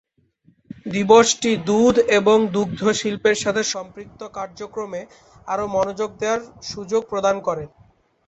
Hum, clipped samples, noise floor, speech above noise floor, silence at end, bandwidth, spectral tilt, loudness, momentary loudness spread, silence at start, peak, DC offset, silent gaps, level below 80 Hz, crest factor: none; under 0.1%; -59 dBFS; 39 dB; 0.6 s; 8.2 kHz; -4 dB/octave; -19 LUFS; 18 LU; 0.85 s; -2 dBFS; under 0.1%; none; -54 dBFS; 18 dB